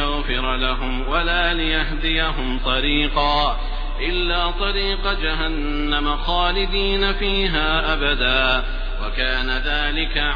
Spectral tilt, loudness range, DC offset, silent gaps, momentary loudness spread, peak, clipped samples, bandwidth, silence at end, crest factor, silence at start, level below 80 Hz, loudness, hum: -6.5 dB/octave; 2 LU; under 0.1%; none; 5 LU; -4 dBFS; under 0.1%; 5.2 kHz; 0 s; 16 dB; 0 s; -24 dBFS; -20 LUFS; none